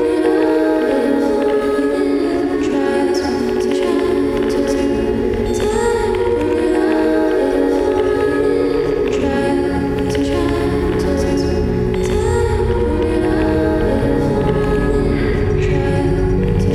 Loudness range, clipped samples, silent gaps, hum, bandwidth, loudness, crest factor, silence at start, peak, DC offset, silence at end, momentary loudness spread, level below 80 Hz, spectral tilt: 1 LU; under 0.1%; none; none; 14.5 kHz; -16 LUFS; 12 dB; 0 s; -4 dBFS; under 0.1%; 0 s; 2 LU; -28 dBFS; -7 dB/octave